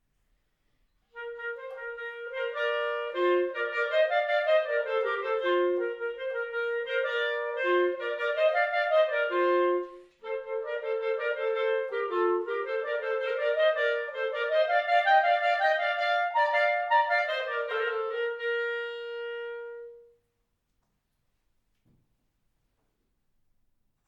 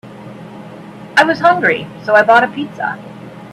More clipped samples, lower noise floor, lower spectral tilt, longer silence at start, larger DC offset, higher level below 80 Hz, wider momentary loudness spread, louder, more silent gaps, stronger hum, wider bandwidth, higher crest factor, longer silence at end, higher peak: neither; first, -77 dBFS vs -33 dBFS; second, -3 dB/octave vs -5 dB/octave; first, 1.15 s vs 0.05 s; neither; second, -76 dBFS vs -58 dBFS; second, 12 LU vs 23 LU; second, -28 LUFS vs -13 LUFS; neither; neither; second, 7.6 kHz vs 12.5 kHz; about the same, 18 dB vs 16 dB; first, 4.05 s vs 0 s; second, -12 dBFS vs 0 dBFS